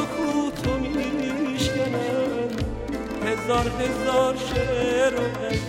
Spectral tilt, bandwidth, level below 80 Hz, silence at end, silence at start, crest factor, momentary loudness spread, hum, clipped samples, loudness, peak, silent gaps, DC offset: -5.5 dB/octave; 16 kHz; -38 dBFS; 0 s; 0 s; 16 dB; 6 LU; none; under 0.1%; -24 LUFS; -8 dBFS; none; under 0.1%